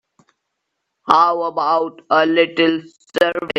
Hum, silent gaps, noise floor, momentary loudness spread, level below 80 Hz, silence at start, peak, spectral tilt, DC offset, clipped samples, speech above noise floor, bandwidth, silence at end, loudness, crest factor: none; none; -76 dBFS; 10 LU; -64 dBFS; 1.05 s; 0 dBFS; -5 dB/octave; under 0.1%; under 0.1%; 59 dB; 12 kHz; 0 s; -17 LUFS; 18 dB